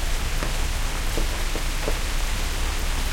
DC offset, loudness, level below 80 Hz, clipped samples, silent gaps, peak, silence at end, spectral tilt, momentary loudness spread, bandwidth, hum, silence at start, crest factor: under 0.1%; -27 LUFS; -24 dBFS; under 0.1%; none; -8 dBFS; 0 s; -3 dB/octave; 1 LU; 17 kHz; none; 0 s; 16 dB